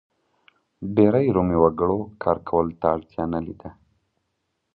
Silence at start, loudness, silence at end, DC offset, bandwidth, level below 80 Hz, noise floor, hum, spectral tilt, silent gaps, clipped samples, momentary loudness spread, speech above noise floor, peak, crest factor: 0.8 s; -22 LUFS; 1.05 s; under 0.1%; 4.6 kHz; -46 dBFS; -76 dBFS; none; -12 dB/octave; none; under 0.1%; 17 LU; 54 dB; -4 dBFS; 20 dB